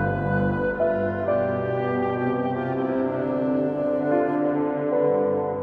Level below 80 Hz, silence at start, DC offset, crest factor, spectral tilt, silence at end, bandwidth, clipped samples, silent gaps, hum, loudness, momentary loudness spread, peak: -50 dBFS; 0 s; under 0.1%; 14 dB; -10.5 dB/octave; 0 s; 4.8 kHz; under 0.1%; none; none; -24 LUFS; 3 LU; -10 dBFS